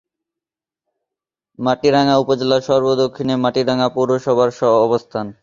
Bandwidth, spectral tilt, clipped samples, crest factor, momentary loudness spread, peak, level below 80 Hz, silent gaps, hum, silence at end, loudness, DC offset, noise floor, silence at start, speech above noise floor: 7.6 kHz; -6 dB/octave; under 0.1%; 16 dB; 5 LU; -2 dBFS; -56 dBFS; none; none; 0.1 s; -16 LUFS; under 0.1%; -87 dBFS; 1.6 s; 71 dB